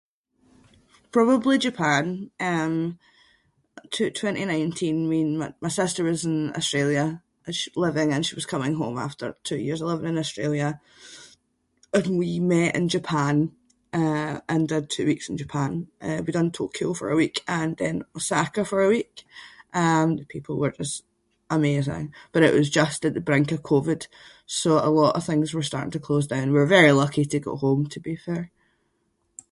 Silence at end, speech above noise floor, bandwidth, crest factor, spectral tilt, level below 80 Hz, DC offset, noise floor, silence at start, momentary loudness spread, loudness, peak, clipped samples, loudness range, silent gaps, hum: 1.05 s; 48 dB; 11.5 kHz; 22 dB; -5.5 dB/octave; -60 dBFS; under 0.1%; -71 dBFS; 1.15 s; 11 LU; -24 LUFS; -2 dBFS; under 0.1%; 5 LU; none; none